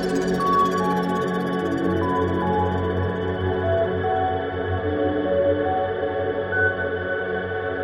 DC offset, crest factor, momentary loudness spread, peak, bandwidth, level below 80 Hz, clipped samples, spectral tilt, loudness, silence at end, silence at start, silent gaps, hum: under 0.1%; 12 dB; 5 LU; -10 dBFS; 15 kHz; -46 dBFS; under 0.1%; -7 dB/octave; -23 LUFS; 0 s; 0 s; none; none